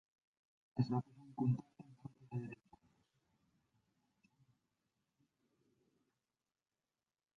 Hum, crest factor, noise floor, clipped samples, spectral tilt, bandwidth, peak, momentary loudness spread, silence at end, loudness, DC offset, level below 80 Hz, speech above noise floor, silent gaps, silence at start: none; 24 dB; under -90 dBFS; under 0.1%; -9.5 dB/octave; 6.2 kHz; -22 dBFS; 19 LU; 4.85 s; -42 LUFS; under 0.1%; -80 dBFS; over 51 dB; none; 0.75 s